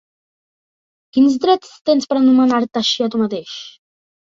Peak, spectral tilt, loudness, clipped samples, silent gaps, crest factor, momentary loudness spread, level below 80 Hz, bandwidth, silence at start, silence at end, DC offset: -2 dBFS; -4.5 dB/octave; -16 LUFS; under 0.1%; 1.81-1.85 s; 16 dB; 11 LU; -64 dBFS; 7.6 kHz; 1.15 s; 0.6 s; under 0.1%